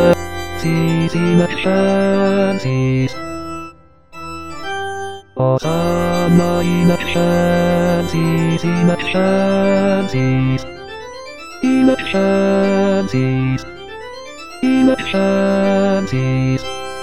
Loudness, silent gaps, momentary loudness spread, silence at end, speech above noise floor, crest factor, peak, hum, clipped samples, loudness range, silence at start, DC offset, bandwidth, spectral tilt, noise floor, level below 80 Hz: -16 LUFS; none; 16 LU; 0 s; 26 dB; 14 dB; 0 dBFS; none; under 0.1%; 4 LU; 0 s; 2%; 12.5 kHz; -7 dB/octave; -40 dBFS; -42 dBFS